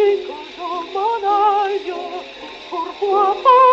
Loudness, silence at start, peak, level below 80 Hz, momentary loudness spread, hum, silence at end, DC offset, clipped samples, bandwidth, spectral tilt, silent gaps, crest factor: -18 LUFS; 0 s; -2 dBFS; -60 dBFS; 16 LU; none; 0 s; under 0.1%; under 0.1%; 7.8 kHz; -3.5 dB/octave; none; 14 dB